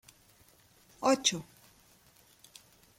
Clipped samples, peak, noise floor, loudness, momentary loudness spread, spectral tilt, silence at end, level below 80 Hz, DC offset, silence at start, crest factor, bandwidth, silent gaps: under 0.1%; -12 dBFS; -63 dBFS; -30 LUFS; 27 LU; -2.5 dB/octave; 1.55 s; -72 dBFS; under 0.1%; 1 s; 24 dB; 16.5 kHz; none